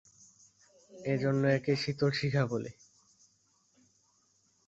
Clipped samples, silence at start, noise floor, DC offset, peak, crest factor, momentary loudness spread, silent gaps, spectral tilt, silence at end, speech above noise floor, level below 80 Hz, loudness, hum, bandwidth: under 0.1%; 0.9 s; -71 dBFS; under 0.1%; -16 dBFS; 18 dB; 10 LU; none; -6.5 dB/octave; 1.95 s; 41 dB; -68 dBFS; -31 LUFS; none; 8 kHz